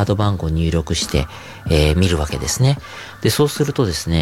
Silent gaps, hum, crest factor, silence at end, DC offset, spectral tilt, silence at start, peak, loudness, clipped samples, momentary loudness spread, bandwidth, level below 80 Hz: none; none; 16 dB; 0 s; under 0.1%; -5 dB/octave; 0 s; -2 dBFS; -18 LUFS; under 0.1%; 7 LU; 16.5 kHz; -30 dBFS